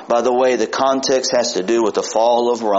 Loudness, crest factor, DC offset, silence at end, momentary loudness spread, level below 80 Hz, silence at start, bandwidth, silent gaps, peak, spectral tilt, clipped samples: -16 LUFS; 14 dB; under 0.1%; 0 s; 2 LU; -62 dBFS; 0 s; 8 kHz; none; -4 dBFS; -2 dB/octave; under 0.1%